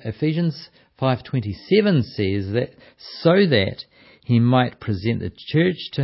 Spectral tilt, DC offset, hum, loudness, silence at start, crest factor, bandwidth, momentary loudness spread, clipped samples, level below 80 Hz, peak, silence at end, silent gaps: -11 dB/octave; under 0.1%; none; -21 LUFS; 0.05 s; 18 dB; 5.8 kHz; 13 LU; under 0.1%; -46 dBFS; -4 dBFS; 0 s; none